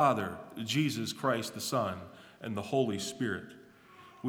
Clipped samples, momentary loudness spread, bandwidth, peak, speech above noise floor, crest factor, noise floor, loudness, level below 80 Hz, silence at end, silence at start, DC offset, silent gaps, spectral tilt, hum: under 0.1%; 12 LU; over 20 kHz; -12 dBFS; 24 dB; 22 dB; -56 dBFS; -33 LUFS; -72 dBFS; 0 s; 0 s; under 0.1%; none; -4.5 dB/octave; none